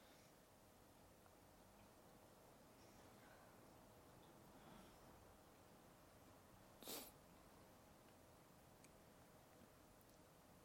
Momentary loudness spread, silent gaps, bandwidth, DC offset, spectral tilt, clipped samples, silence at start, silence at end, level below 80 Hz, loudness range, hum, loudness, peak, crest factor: 6 LU; none; 16.5 kHz; under 0.1%; -3.5 dB/octave; under 0.1%; 0 s; 0 s; -80 dBFS; 6 LU; none; -65 LUFS; -36 dBFS; 30 dB